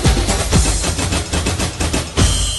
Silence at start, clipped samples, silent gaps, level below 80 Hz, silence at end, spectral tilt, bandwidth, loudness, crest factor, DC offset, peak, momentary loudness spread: 0 s; under 0.1%; none; -20 dBFS; 0 s; -3.5 dB/octave; 12 kHz; -17 LUFS; 14 dB; under 0.1%; -2 dBFS; 4 LU